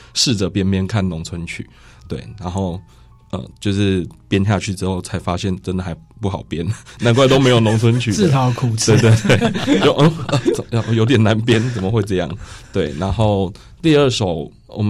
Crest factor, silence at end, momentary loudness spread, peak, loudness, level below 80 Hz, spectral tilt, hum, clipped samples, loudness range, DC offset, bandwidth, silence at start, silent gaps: 12 dB; 0 s; 15 LU; -4 dBFS; -17 LUFS; -40 dBFS; -5.5 dB/octave; none; under 0.1%; 8 LU; under 0.1%; 12.5 kHz; 0.15 s; none